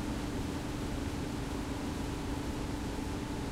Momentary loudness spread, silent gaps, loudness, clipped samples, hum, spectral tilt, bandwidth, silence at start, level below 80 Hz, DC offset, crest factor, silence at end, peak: 1 LU; none; -38 LUFS; under 0.1%; none; -5.5 dB/octave; 16 kHz; 0 s; -42 dBFS; under 0.1%; 12 dB; 0 s; -24 dBFS